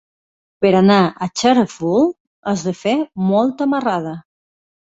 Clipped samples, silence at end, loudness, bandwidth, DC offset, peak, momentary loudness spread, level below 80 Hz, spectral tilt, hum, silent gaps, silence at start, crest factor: under 0.1%; 0.65 s; -17 LUFS; 8 kHz; under 0.1%; -2 dBFS; 10 LU; -58 dBFS; -6 dB/octave; none; 2.20-2.43 s; 0.6 s; 16 dB